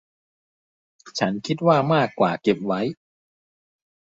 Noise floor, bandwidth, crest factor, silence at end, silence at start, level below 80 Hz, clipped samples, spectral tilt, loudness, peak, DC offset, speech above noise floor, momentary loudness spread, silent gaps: under -90 dBFS; 8 kHz; 20 dB; 1.2 s; 1.05 s; -64 dBFS; under 0.1%; -6 dB/octave; -22 LUFS; -4 dBFS; under 0.1%; over 69 dB; 8 LU; none